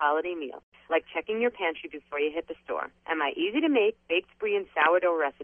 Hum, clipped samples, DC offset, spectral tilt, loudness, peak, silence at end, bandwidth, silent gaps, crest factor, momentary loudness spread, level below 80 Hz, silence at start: none; under 0.1%; under 0.1%; -6 dB/octave; -28 LUFS; -10 dBFS; 0 s; 3.6 kHz; 0.63-0.72 s; 18 dB; 12 LU; -68 dBFS; 0 s